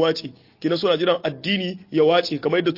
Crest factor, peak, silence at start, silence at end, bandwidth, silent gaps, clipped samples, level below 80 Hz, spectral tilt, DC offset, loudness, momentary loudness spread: 16 dB; -6 dBFS; 0 s; 0 s; 5.8 kHz; none; under 0.1%; -66 dBFS; -6 dB/octave; under 0.1%; -21 LUFS; 10 LU